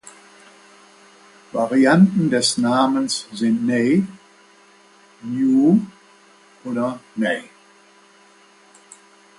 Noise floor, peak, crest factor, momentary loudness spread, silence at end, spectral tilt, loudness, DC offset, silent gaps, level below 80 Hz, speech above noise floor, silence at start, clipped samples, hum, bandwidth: -51 dBFS; -4 dBFS; 18 dB; 14 LU; 1.95 s; -5 dB/octave; -19 LUFS; under 0.1%; none; -64 dBFS; 34 dB; 1.55 s; under 0.1%; none; 11.5 kHz